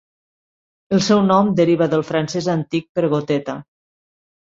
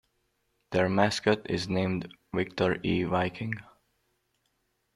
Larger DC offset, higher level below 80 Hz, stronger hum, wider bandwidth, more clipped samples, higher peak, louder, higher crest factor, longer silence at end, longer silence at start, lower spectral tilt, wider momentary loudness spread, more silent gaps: neither; about the same, -58 dBFS vs -60 dBFS; neither; second, 7.8 kHz vs 12 kHz; neither; first, -2 dBFS vs -8 dBFS; first, -18 LUFS vs -29 LUFS; about the same, 18 dB vs 22 dB; second, 0.85 s vs 1.35 s; first, 0.9 s vs 0.7 s; about the same, -6 dB/octave vs -6 dB/octave; about the same, 8 LU vs 10 LU; first, 2.89-2.95 s vs none